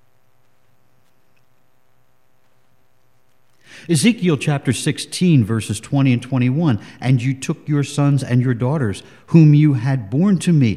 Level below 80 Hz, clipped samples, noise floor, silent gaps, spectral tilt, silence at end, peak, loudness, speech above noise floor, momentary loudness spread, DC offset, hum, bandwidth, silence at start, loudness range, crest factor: -60 dBFS; under 0.1%; -63 dBFS; none; -6.5 dB/octave; 0 s; 0 dBFS; -17 LUFS; 47 dB; 9 LU; 0.3%; none; 13 kHz; 3.75 s; 6 LU; 18 dB